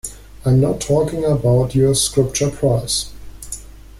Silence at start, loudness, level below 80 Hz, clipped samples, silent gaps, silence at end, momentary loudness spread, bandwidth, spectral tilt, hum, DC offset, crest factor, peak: 0.05 s; -17 LUFS; -36 dBFS; under 0.1%; none; 0 s; 17 LU; 15.5 kHz; -5.5 dB/octave; none; under 0.1%; 16 dB; -2 dBFS